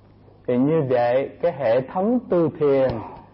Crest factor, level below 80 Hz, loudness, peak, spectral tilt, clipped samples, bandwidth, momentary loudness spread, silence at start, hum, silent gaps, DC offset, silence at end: 10 dB; -54 dBFS; -21 LUFS; -10 dBFS; -12.5 dB/octave; under 0.1%; 5.8 kHz; 6 LU; 0.5 s; none; none; under 0.1%; 0.1 s